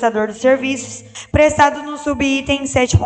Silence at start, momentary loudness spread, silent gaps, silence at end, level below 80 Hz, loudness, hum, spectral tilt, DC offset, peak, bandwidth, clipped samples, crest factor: 0 s; 11 LU; none; 0 s; -34 dBFS; -16 LUFS; none; -5 dB/octave; under 0.1%; 0 dBFS; 9.2 kHz; under 0.1%; 16 dB